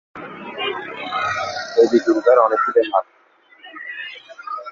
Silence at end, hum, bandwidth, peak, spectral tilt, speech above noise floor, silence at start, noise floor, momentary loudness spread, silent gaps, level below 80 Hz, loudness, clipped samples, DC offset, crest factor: 0 s; none; 7.4 kHz; -2 dBFS; -4.5 dB/octave; 33 dB; 0.15 s; -48 dBFS; 19 LU; none; -64 dBFS; -18 LUFS; under 0.1%; under 0.1%; 18 dB